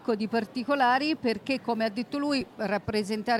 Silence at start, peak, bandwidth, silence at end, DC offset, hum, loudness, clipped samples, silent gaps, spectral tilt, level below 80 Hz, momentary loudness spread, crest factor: 0 s; -14 dBFS; 15.5 kHz; 0 s; under 0.1%; none; -28 LUFS; under 0.1%; none; -5 dB/octave; -62 dBFS; 6 LU; 14 dB